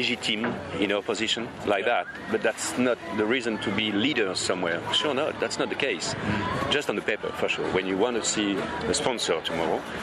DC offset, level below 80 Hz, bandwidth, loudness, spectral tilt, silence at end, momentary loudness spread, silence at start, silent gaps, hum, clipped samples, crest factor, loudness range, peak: under 0.1%; -56 dBFS; 13.5 kHz; -26 LUFS; -3 dB/octave; 0 s; 4 LU; 0 s; none; none; under 0.1%; 18 dB; 1 LU; -8 dBFS